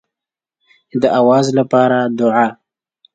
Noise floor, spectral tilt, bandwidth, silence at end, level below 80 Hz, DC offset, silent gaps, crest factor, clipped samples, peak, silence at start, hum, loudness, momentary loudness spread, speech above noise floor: -86 dBFS; -6.5 dB/octave; 9.2 kHz; 0.6 s; -62 dBFS; under 0.1%; none; 16 dB; under 0.1%; 0 dBFS; 0.95 s; none; -14 LUFS; 6 LU; 74 dB